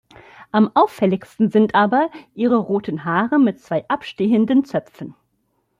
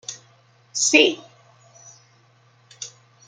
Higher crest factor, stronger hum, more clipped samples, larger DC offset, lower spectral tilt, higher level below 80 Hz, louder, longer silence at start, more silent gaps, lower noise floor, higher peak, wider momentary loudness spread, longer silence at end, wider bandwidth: second, 16 dB vs 24 dB; neither; neither; neither; first, -8 dB/octave vs -0.5 dB/octave; first, -62 dBFS vs -78 dBFS; about the same, -18 LUFS vs -17 LUFS; first, 0.4 s vs 0.1 s; neither; first, -68 dBFS vs -57 dBFS; about the same, -4 dBFS vs -2 dBFS; second, 10 LU vs 22 LU; first, 0.7 s vs 0.4 s; about the same, 10 kHz vs 10 kHz